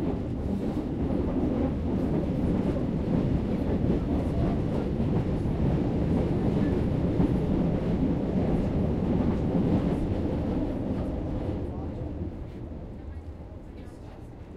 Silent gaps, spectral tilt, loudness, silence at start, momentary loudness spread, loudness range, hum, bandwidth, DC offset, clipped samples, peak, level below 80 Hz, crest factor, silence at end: none; -10 dB/octave; -28 LUFS; 0 s; 14 LU; 7 LU; none; 10.5 kHz; under 0.1%; under 0.1%; -12 dBFS; -36 dBFS; 14 dB; 0 s